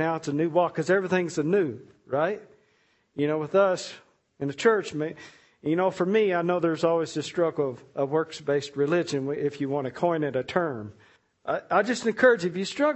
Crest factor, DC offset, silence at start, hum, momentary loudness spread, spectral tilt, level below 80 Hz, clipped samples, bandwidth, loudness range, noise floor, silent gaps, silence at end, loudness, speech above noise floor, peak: 20 dB; under 0.1%; 0 s; none; 10 LU; -5.5 dB/octave; -70 dBFS; under 0.1%; 8.4 kHz; 2 LU; -67 dBFS; none; 0 s; -26 LUFS; 41 dB; -6 dBFS